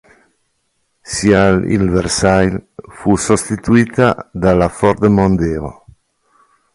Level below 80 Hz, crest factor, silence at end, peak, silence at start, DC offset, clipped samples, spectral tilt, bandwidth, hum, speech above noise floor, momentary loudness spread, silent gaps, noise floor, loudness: -34 dBFS; 14 dB; 1 s; 0 dBFS; 1.05 s; under 0.1%; under 0.1%; -5.5 dB/octave; 11.5 kHz; none; 52 dB; 9 LU; none; -65 dBFS; -14 LUFS